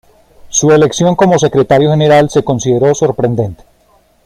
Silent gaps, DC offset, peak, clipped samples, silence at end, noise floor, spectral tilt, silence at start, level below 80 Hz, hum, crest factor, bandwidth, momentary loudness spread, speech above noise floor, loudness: none; under 0.1%; 0 dBFS; under 0.1%; 0.7 s; -51 dBFS; -5.5 dB/octave; 0.45 s; -42 dBFS; none; 10 dB; 13 kHz; 6 LU; 41 dB; -10 LUFS